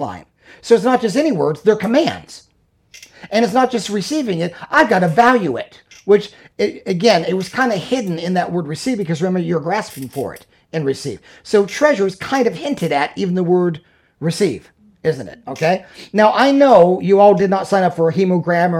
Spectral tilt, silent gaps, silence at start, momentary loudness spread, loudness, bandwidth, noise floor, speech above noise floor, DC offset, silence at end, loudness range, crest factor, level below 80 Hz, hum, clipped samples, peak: -6 dB/octave; none; 0 s; 15 LU; -16 LUFS; 15.5 kHz; -49 dBFS; 33 dB; under 0.1%; 0 s; 6 LU; 16 dB; -58 dBFS; none; under 0.1%; 0 dBFS